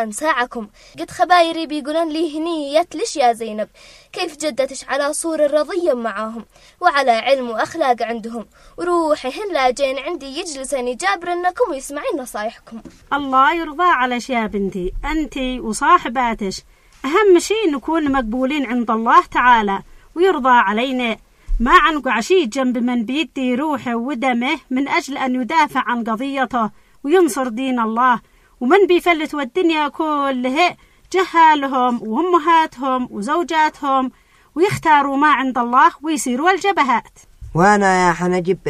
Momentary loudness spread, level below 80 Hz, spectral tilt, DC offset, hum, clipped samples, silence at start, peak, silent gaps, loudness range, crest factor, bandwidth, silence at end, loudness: 12 LU; -40 dBFS; -4 dB/octave; under 0.1%; none; under 0.1%; 0 s; 0 dBFS; none; 5 LU; 18 dB; 15 kHz; 0 s; -17 LUFS